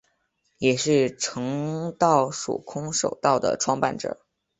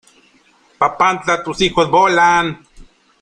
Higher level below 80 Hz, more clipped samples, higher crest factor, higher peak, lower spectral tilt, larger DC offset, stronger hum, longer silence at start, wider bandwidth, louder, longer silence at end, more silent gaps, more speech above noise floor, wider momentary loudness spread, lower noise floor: second, -62 dBFS vs -46 dBFS; neither; about the same, 20 dB vs 16 dB; second, -4 dBFS vs 0 dBFS; about the same, -4 dB/octave vs -4 dB/octave; neither; neither; second, 0.6 s vs 0.8 s; second, 8.4 kHz vs 10.5 kHz; second, -24 LUFS vs -14 LUFS; about the same, 0.45 s vs 0.4 s; neither; first, 48 dB vs 39 dB; about the same, 10 LU vs 8 LU; first, -71 dBFS vs -53 dBFS